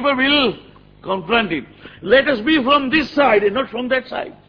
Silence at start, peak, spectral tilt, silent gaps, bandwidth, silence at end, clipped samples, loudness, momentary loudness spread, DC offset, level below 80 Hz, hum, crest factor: 0 s; 0 dBFS; -6 dB/octave; none; 5.4 kHz; 0.2 s; under 0.1%; -16 LUFS; 12 LU; under 0.1%; -48 dBFS; none; 18 dB